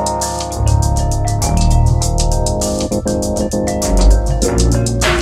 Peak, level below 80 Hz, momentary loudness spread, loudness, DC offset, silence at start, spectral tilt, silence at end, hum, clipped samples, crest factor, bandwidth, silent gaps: 0 dBFS; -16 dBFS; 4 LU; -15 LUFS; under 0.1%; 0 s; -5 dB/octave; 0 s; none; under 0.1%; 12 dB; 15 kHz; none